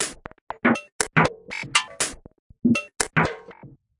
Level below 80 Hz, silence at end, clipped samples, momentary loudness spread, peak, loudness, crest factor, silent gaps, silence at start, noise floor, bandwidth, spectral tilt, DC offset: -52 dBFS; 0.3 s; under 0.1%; 12 LU; -2 dBFS; -23 LUFS; 24 dB; 0.41-0.47 s, 0.92-0.99 s, 2.39-2.50 s; 0 s; -47 dBFS; 11.5 kHz; -3.5 dB/octave; under 0.1%